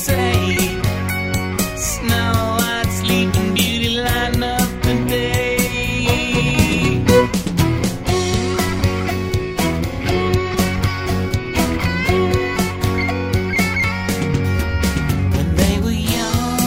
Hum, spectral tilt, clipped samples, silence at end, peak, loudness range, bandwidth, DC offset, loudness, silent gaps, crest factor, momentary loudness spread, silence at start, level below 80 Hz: none; -5 dB/octave; under 0.1%; 0 s; 0 dBFS; 2 LU; 16.5 kHz; under 0.1%; -18 LUFS; none; 16 dB; 4 LU; 0 s; -28 dBFS